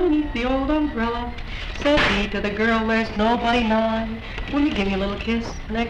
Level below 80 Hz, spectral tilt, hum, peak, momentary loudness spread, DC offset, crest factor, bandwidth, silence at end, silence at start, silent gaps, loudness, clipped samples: -34 dBFS; -5.5 dB/octave; none; -6 dBFS; 10 LU; under 0.1%; 16 dB; 9.4 kHz; 0 s; 0 s; none; -22 LUFS; under 0.1%